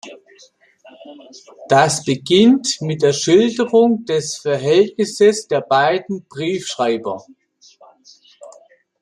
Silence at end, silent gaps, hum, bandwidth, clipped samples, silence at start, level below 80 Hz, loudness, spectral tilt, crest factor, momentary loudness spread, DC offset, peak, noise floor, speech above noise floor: 0.5 s; none; none; 13 kHz; under 0.1%; 0.05 s; -62 dBFS; -16 LUFS; -4.5 dB/octave; 16 dB; 10 LU; under 0.1%; -2 dBFS; -51 dBFS; 34 dB